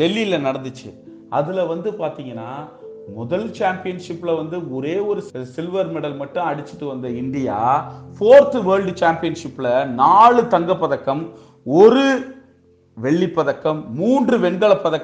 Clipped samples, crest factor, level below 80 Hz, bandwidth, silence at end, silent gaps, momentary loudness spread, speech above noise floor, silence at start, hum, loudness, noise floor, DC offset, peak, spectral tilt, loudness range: under 0.1%; 18 dB; -60 dBFS; 9 kHz; 0 s; none; 20 LU; 35 dB; 0 s; none; -18 LUFS; -53 dBFS; under 0.1%; 0 dBFS; -6.5 dB/octave; 10 LU